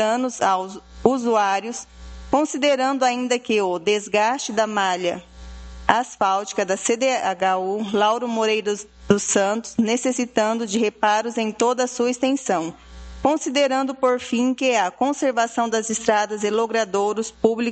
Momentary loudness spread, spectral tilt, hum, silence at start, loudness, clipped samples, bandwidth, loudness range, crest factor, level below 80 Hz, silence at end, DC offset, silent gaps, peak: 6 LU; -3.5 dB/octave; none; 0 s; -21 LUFS; under 0.1%; 9 kHz; 1 LU; 22 dB; -48 dBFS; 0 s; under 0.1%; none; 0 dBFS